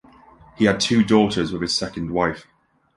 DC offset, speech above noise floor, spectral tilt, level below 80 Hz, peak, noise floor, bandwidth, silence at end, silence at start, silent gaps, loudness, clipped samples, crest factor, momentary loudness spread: under 0.1%; 29 dB; -4.5 dB/octave; -48 dBFS; -2 dBFS; -49 dBFS; 11.5 kHz; 0.55 s; 0.6 s; none; -20 LUFS; under 0.1%; 18 dB; 8 LU